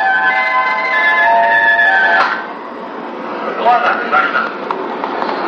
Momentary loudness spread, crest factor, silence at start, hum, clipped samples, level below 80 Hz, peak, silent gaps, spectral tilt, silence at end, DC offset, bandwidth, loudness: 15 LU; 12 dB; 0 s; none; under 0.1%; -66 dBFS; 0 dBFS; none; -4 dB/octave; 0 s; under 0.1%; 8.4 kHz; -12 LUFS